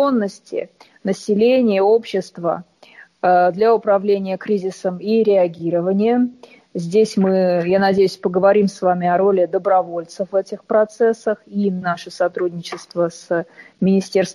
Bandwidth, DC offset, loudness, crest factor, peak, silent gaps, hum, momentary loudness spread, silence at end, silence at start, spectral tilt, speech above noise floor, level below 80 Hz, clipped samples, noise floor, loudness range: 12 kHz; under 0.1%; -18 LUFS; 14 dB; -4 dBFS; none; none; 10 LU; 0 s; 0 s; -6.5 dB/octave; 29 dB; -64 dBFS; under 0.1%; -46 dBFS; 4 LU